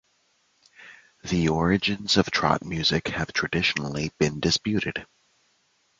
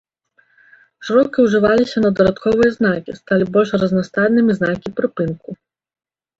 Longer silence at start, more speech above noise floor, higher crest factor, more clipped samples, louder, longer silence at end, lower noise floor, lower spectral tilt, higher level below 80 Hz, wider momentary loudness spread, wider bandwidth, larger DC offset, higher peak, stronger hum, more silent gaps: second, 0.8 s vs 1 s; about the same, 43 dB vs 44 dB; first, 24 dB vs 16 dB; neither; second, -24 LUFS vs -16 LUFS; about the same, 0.95 s vs 0.85 s; first, -68 dBFS vs -59 dBFS; second, -4.5 dB/octave vs -7 dB/octave; about the same, -48 dBFS vs -48 dBFS; about the same, 7 LU vs 9 LU; first, 9.4 kHz vs 7.8 kHz; neither; about the same, -4 dBFS vs -2 dBFS; neither; neither